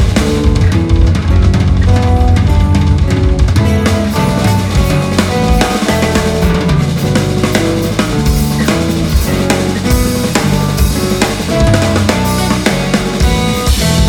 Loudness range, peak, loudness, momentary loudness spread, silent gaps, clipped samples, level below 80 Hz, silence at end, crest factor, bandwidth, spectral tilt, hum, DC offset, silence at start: 2 LU; 0 dBFS; -12 LUFS; 3 LU; none; under 0.1%; -16 dBFS; 0 s; 10 dB; 18.5 kHz; -5.5 dB/octave; none; under 0.1%; 0 s